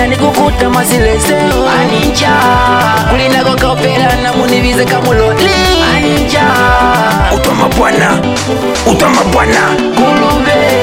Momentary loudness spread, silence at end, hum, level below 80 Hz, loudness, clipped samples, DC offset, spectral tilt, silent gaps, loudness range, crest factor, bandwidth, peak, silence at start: 2 LU; 0 s; none; -22 dBFS; -9 LUFS; under 0.1%; under 0.1%; -4.5 dB/octave; none; 1 LU; 8 dB; 17 kHz; 0 dBFS; 0 s